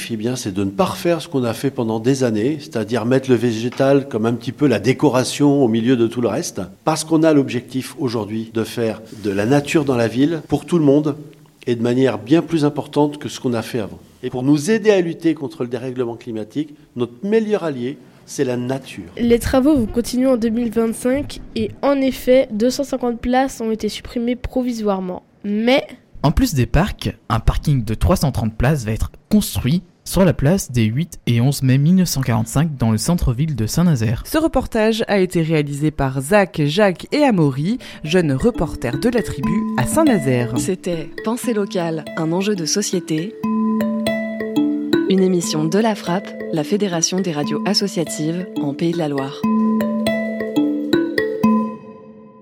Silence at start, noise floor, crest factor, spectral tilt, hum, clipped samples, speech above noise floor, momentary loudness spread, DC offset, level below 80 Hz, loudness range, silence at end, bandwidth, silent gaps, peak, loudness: 0 s; -40 dBFS; 18 dB; -6 dB/octave; none; under 0.1%; 22 dB; 9 LU; under 0.1%; -34 dBFS; 3 LU; 0.15 s; 16.5 kHz; none; 0 dBFS; -19 LUFS